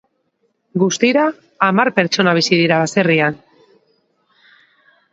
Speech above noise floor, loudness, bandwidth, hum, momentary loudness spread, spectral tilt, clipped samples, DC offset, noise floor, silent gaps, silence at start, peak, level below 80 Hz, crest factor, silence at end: 51 dB; -15 LUFS; 8 kHz; none; 7 LU; -4.5 dB/octave; under 0.1%; under 0.1%; -66 dBFS; none; 0.75 s; 0 dBFS; -64 dBFS; 18 dB; 1.75 s